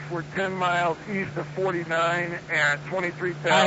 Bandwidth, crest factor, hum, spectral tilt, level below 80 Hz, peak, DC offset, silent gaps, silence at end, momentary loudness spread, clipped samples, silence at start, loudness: 8 kHz; 18 dB; none; -4.5 dB/octave; -60 dBFS; -8 dBFS; under 0.1%; none; 0 s; 7 LU; under 0.1%; 0 s; -26 LUFS